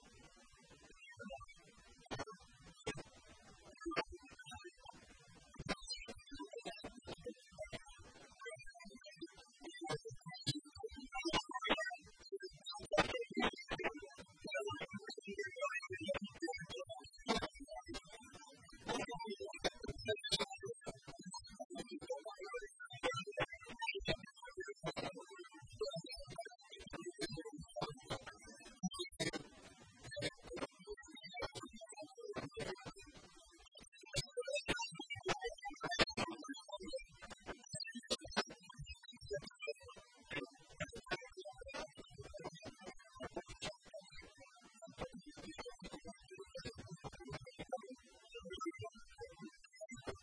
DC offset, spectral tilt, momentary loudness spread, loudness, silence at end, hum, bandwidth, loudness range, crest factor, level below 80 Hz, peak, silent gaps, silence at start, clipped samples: under 0.1%; -3.5 dB/octave; 18 LU; -46 LUFS; 0 s; none; 10.5 kHz; 10 LU; 30 dB; -64 dBFS; -18 dBFS; 21.65-21.70 s, 33.88-33.92 s; 0 s; under 0.1%